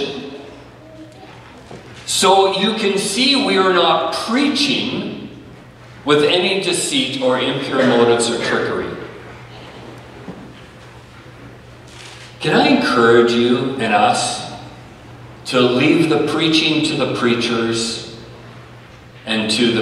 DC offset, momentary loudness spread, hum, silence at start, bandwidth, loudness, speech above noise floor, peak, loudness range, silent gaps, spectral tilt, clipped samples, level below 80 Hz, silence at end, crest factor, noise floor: under 0.1%; 22 LU; none; 0 s; 13.5 kHz; -16 LUFS; 24 dB; 0 dBFS; 7 LU; none; -3.5 dB/octave; under 0.1%; -52 dBFS; 0 s; 18 dB; -40 dBFS